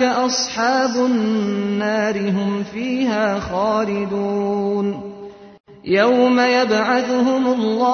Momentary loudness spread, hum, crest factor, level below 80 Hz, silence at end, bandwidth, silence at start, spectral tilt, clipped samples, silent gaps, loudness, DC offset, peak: 8 LU; none; 14 dB; -52 dBFS; 0 s; 6.6 kHz; 0 s; -4.5 dB/octave; under 0.1%; 5.60-5.64 s; -18 LUFS; under 0.1%; -4 dBFS